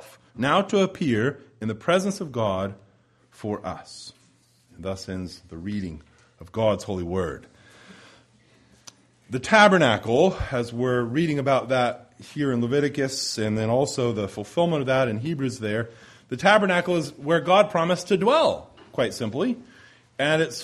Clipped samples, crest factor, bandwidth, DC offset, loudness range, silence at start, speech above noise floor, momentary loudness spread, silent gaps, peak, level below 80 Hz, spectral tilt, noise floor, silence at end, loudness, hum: under 0.1%; 22 dB; 14.5 kHz; under 0.1%; 10 LU; 0 s; 37 dB; 16 LU; none; -2 dBFS; -52 dBFS; -5 dB/octave; -60 dBFS; 0 s; -23 LUFS; none